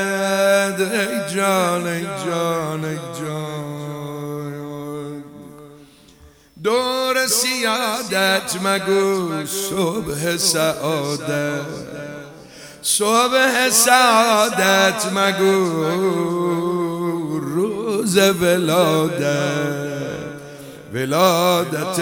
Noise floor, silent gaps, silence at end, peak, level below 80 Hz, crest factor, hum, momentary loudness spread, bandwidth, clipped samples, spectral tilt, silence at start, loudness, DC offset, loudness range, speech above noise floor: -48 dBFS; none; 0 s; 0 dBFS; -58 dBFS; 20 dB; none; 15 LU; 19 kHz; under 0.1%; -3.5 dB/octave; 0 s; -18 LUFS; under 0.1%; 11 LU; 30 dB